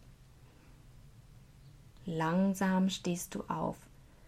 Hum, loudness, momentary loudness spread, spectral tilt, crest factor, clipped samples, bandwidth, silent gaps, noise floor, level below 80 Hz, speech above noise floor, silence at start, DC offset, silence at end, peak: none; -34 LUFS; 11 LU; -5.5 dB/octave; 18 dB; under 0.1%; 15 kHz; none; -58 dBFS; -60 dBFS; 26 dB; 0.05 s; under 0.1%; 0 s; -20 dBFS